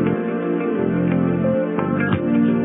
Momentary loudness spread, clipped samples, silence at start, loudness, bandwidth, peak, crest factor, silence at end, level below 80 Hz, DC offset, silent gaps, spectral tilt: 4 LU; under 0.1%; 0 s; -20 LUFS; 3.8 kHz; -6 dBFS; 12 dB; 0 s; -54 dBFS; under 0.1%; none; -8 dB/octave